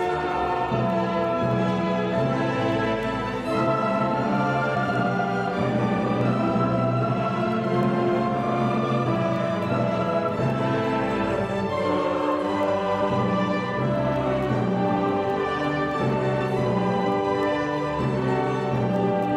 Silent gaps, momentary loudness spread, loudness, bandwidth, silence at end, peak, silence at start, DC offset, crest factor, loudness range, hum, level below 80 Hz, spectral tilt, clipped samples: none; 2 LU; -24 LUFS; 10.5 kHz; 0 s; -10 dBFS; 0 s; under 0.1%; 14 dB; 1 LU; none; -50 dBFS; -7.5 dB/octave; under 0.1%